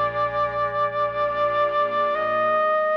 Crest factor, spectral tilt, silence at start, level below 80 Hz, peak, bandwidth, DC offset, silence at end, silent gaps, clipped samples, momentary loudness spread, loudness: 10 dB; -6 dB/octave; 0 s; -54 dBFS; -12 dBFS; 6.2 kHz; under 0.1%; 0 s; none; under 0.1%; 3 LU; -22 LUFS